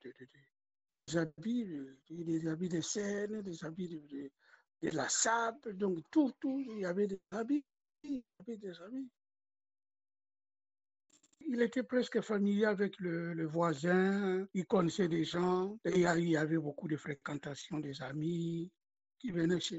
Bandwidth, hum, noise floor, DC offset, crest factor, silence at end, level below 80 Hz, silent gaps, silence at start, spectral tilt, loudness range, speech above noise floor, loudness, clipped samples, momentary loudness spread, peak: 8.2 kHz; none; -55 dBFS; under 0.1%; 20 dB; 0 s; -74 dBFS; none; 0.05 s; -5 dB/octave; 10 LU; 20 dB; -36 LUFS; under 0.1%; 15 LU; -18 dBFS